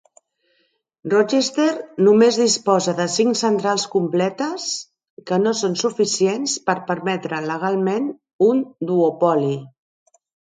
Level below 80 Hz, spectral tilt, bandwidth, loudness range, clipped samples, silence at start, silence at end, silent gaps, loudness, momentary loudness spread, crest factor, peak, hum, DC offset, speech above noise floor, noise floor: -68 dBFS; -4 dB/octave; 9.6 kHz; 4 LU; under 0.1%; 1.05 s; 0.8 s; 5.10-5.17 s, 8.33-8.39 s; -19 LUFS; 9 LU; 18 dB; -2 dBFS; none; under 0.1%; 47 dB; -66 dBFS